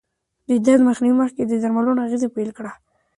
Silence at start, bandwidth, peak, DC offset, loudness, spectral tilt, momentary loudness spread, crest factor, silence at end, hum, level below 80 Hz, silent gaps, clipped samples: 0.5 s; 11 kHz; -4 dBFS; under 0.1%; -19 LUFS; -6.5 dB/octave; 13 LU; 16 dB; 0.45 s; none; -62 dBFS; none; under 0.1%